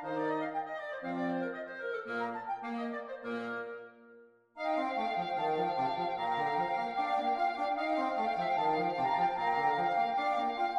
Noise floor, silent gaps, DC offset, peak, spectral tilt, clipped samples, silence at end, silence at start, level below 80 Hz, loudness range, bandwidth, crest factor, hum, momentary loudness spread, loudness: -59 dBFS; none; under 0.1%; -20 dBFS; -6 dB/octave; under 0.1%; 0 s; 0 s; -72 dBFS; 7 LU; 10.5 kHz; 14 dB; none; 9 LU; -33 LUFS